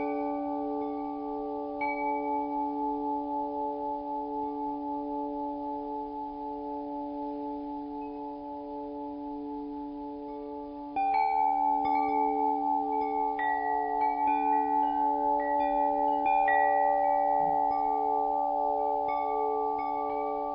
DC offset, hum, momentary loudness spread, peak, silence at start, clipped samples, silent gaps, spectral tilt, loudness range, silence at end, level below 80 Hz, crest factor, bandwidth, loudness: under 0.1%; none; 12 LU; -14 dBFS; 0 s; under 0.1%; none; -9 dB/octave; 11 LU; 0 s; -60 dBFS; 16 dB; 5.4 kHz; -30 LUFS